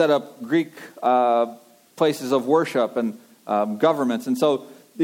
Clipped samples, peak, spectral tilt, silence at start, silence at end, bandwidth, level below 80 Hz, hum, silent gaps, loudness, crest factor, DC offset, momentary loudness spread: under 0.1%; -6 dBFS; -5.5 dB/octave; 0 s; 0 s; 17 kHz; -80 dBFS; none; none; -22 LUFS; 16 dB; under 0.1%; 9 LU